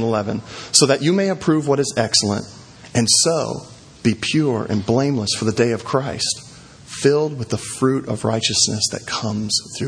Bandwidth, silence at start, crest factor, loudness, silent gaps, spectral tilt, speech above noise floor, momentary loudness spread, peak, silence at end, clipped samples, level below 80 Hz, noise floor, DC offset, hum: 11 kHz; 0 s; 20 dB; -19 LUFS; none; -3.5 dB/octave; 20 dB; 11 LU; 0 dBFS; 0 s; under 0.1%; -52 dBFS; -39 dBFS; under 0.1%; none